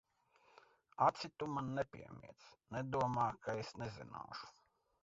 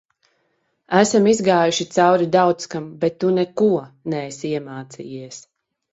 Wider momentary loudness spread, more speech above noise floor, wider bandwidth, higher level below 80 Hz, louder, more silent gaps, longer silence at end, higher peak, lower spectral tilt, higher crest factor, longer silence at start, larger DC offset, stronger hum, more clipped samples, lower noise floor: first, 21 LU vs 18 LU; second, 32 dB vs 50 dB; about the same, 7.6 kHz vs 8 kHz; second, -70 dBFS vs -62 dBFS; second, -41 LUFS vs -19 LUFS; neither; about the same, 0.5 s vs 0.55 s; second, -18 dBFS vs 0 dBFS; about the same, -5 dB/octave vs -5 dB/octave; about the same, 24 dB vs 20 dB; about the same, 1 s vs 0.9 s; neither; neither; neither; first, -73 dBFS vs -68 dBFS